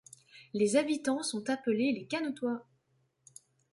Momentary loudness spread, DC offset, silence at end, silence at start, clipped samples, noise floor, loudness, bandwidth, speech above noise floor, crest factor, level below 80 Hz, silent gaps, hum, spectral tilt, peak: 13 LU; under 0.1%; 1.1 s; 0.35 s; under 0.1%; -75 dBFS; -32 LUFS; 11.5 kHz; 43 dB; 20 dB; -78 dBFS; none; none; -4 dB/octave; -14 dBFS